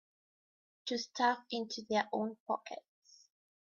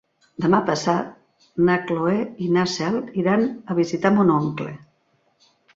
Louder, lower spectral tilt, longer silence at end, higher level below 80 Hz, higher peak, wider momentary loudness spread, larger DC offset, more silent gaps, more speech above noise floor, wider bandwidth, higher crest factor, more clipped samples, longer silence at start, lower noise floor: second, -37 LUFS vs -21 LUFS; second, -1.5 dB/octave vs -6.5 dB/octave; second, 0.85 s vs 1 s; second, -84 dBFS vs -62 dBFS; second, -18 dBFS vs -4 dBFS; about the same, 12 LU vs 14 LU; neither; first, 2.40-2.46 s vs none; first, over 54 dB vs 45 dB; about the same, 7.2 kHz vs 7.8 kHz; about the same, 20 dB vs 18 dB; neither; first, 0.85 s vs 0.4 s; first, under -90 dBFS vs -65 dBFS